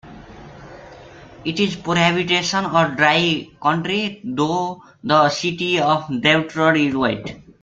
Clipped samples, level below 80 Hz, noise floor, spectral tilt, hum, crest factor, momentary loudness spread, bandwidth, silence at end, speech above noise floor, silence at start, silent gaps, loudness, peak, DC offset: under 0.1%; -54 dBFS; -41 dBFS; -4.5 dB/octave; none; 18 dB; 9 LU; 8.8 kHz; 0.2 s; 22 dB; 0.05 s; none; -18 LUFS; -2 dBFS; under 0.1%